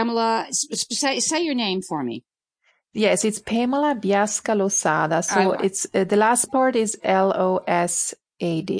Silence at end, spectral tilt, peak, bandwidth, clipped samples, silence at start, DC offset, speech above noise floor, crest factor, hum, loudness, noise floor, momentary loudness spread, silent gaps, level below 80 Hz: 0 s; -3.5 dB/octave; -4 dBFS; 10.5 kHz; under 0.1%; 0 s; under 0.1%; 46 dB; 18 dB; none; -21 LUFS; -67 dBFS; 7 LU; none; -64 dBFS